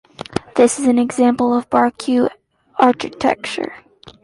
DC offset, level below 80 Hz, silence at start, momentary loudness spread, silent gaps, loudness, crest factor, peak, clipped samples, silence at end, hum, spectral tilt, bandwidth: under 0.1%; -54 dBFS; 0.2 s; 12 LU; none; -17 LUFS; 16 dB; 0 dBFS; under 0.1%; 0.15 s; none; -4.5 dB/octave; 11.5 kHz